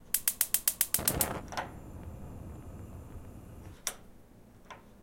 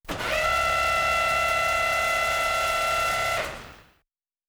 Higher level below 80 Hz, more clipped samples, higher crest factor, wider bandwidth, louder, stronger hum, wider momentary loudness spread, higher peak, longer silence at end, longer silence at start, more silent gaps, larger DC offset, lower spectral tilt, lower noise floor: second, -52 dBFS vs -44 dBFS; neither; first, 30 dB vs 14 dB; second, 17 kHz vs over 20 kHz; second, -30 LUFS vs -23 LUFS; neither; first, 23 LU vs 5 LU; first, -6 dBFS vs -10 dBFS; second, 0 s vs 0.7 s; about the same, 0 s vs 0.05 s; neither; neither; about the same, -2 dB/octave vs -1.5 dB/octave; second, -55 dBFS vs -78 dBFS